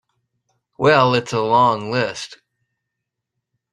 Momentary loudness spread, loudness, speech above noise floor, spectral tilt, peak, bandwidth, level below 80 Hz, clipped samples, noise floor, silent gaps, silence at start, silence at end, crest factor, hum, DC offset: 13 LU; -17 LUFS; 64 dB; -5.5 dB/octave; -2 dBFS; 11 kHz; -60 dBFS; under 0.1%; -80 dBFS; none; 0.8 s; 1.4 s; 20 dB; none; under 0.1%